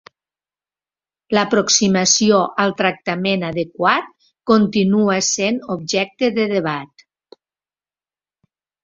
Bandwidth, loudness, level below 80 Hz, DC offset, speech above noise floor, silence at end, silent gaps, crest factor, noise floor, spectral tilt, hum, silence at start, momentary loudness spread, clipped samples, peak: 7.8 kHz; -17 LUFS; -58 dBFS; under 0.1%; over 73 dB; 2 s; none; 18 dB; under -90 dBFS; -3.5 dB/octave; none; 1.3 s; 8 LU; under 0.1%; 0 dBFS